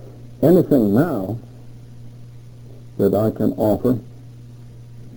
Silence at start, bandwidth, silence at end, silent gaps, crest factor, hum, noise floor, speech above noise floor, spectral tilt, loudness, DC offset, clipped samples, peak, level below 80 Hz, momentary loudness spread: 0 s; over 20 kHz; 0 s; none; 18 dB; 60 Hz at -40 dBFS; -39 dBFS; 22 dB; -9.5 dB/octave; -18 LUFS; under 0.1%; under 0.1%; -2 dBFS; -48 dBFS; 26 LU